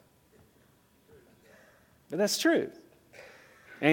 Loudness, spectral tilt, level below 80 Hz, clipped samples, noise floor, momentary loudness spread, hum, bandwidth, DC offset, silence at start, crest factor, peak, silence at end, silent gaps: -29 LUFS; -3.5 dB/octave; -76 dBFS; under 0.1%; -64 dBFS; 26 LU; none; 17.5 kHz; under 0.1%; 2.1 s; 26 dB; -8 dBFS; 0 s; none